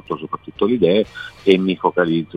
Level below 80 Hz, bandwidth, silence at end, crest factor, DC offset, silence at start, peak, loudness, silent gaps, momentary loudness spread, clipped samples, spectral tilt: -54 dBFS; 7.6 kHz; 0 s; 18 dB; under 0.1%; 0.1 s; 0 dBFS; -18 LUFS; none; 11 LU; under 0.1%; -7.5 dB/octave